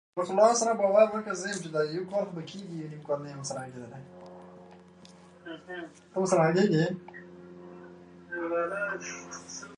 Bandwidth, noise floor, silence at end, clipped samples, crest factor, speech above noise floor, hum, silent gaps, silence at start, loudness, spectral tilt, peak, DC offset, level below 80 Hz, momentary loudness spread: 11 kHz; -53 dBFS; 0 s; under 0.1%; 22 dB; 24 dB; none; none; 0.15 s; -28 LUFS; -5 dB/octave; -8 dBFS; under 0.1%; -72 dBFS; 25 LU